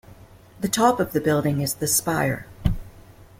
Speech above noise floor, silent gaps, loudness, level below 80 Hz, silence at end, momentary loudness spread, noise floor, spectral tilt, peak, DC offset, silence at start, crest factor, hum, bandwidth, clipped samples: 25 dB; none; -23 LUFS; -38 dBFS; 0.4 s; 8 LU; -47 dBFS; -4.5 dB/octave; -6 dBFS; under 0.1%; 0.1 s; 18 dB; none; 16.5 kHz; under 0.1%